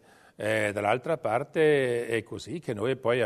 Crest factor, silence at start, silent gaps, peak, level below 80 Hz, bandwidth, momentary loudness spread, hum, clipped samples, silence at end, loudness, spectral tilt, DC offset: 18 dB; 0.4 s; none; -10 dBFS; -68 dBFS; 13.5 kHz; 11 LU; none; under 0.1%; 0 s; -28 LUFS; -5.5 dB/octave; under 0.1%